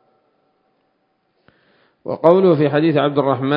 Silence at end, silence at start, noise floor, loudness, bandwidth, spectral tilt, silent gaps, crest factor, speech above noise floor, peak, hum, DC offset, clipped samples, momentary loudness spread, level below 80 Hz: 0 s; 2.05 s; -66 dBFS; -15 LUFS; 5.4 kHz; -10 dB/octave; none; 18 dB; 51 dB; 0 dBFS; none; under 0.1%; under 0.1%; 12 LU; -66 dBFS